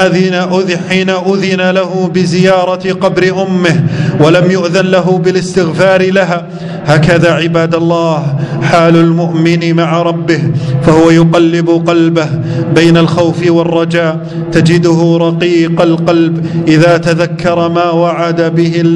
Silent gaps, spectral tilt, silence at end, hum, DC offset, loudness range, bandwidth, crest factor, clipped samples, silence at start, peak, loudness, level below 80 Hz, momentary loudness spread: none; -6.5 dB/octave; 0 s; none; under 0.1%; 1 LU; 10.5 kHz; 8 dB; 2%; 0 s; 0 dBFS; -9 LUFS; -42 dBFS; 5 LU